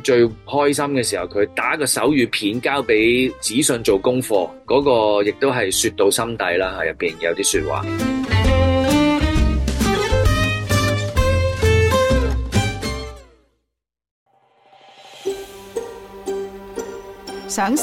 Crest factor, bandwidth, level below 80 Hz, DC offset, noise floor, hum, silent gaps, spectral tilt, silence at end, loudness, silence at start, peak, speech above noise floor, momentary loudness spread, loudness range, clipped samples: 14 dB; 16.5 kHz; -30 dBFS; under 0.1%; -78 dBFS; none; 14.11-14.26 s; -4.5 dB/octave; 0 s; -18 LUFS; 0 s; -4 dBFS; 60 dB; 14 LU; 14 LU; under 0.1%